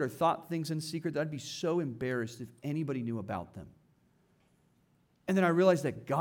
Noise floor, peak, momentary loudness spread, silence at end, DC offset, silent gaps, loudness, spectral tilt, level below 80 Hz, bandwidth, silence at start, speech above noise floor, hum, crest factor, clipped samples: -70 dBFS; -14 dBFS; 14 LU; 0 s; under 0.1%; none; -33 LUFS; -6 dB/octave; -72 dBFS; 18 kHz; 0 s; 38 dB; none; 20 dB; under 0.1%